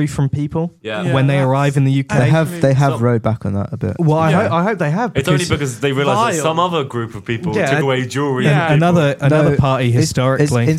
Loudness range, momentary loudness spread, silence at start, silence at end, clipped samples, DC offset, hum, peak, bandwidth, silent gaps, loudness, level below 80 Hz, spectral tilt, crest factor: 2 LU; 8 LU; 0 s; 0 s; under 0.1%; under 0.1%; none; 0 dBFS; 14 kHz; none; -16 LUFS; -46 dBFS; -6.5 dB/octave; 14 dB